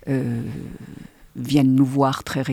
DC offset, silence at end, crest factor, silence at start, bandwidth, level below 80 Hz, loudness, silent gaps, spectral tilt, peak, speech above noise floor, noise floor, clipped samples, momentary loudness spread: under 0.1%; 0 s; 18 dB; 0.05 s; 15 kHz; -50 dBFS; -20 LUFS; none; -7 dB/octave; -4 dBFS; 21 dB; -41 dBFS; under 0.1%; 21 LU